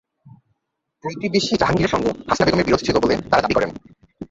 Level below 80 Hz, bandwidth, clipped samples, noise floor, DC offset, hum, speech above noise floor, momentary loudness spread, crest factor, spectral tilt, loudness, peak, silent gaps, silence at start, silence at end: -42 dBFS; 8 kHz; under 0.1%; -76 dBFS; under 0.1%; none; 58 dB; 10 LU; 18 dB; -5 dB/octave; -19 LUFS; -2 dBFS; none; 0.25 s; 0.05 s